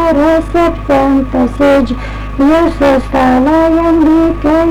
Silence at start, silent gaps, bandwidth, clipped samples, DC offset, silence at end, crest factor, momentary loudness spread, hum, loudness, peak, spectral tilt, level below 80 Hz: 0 s; none; 12 kHz; under 0.1%; under 0.1%; 0 s; 6 dB; 4 LU; none; -10 LUFS; -4 dBFS; -7 dB/octave; -24 dBFS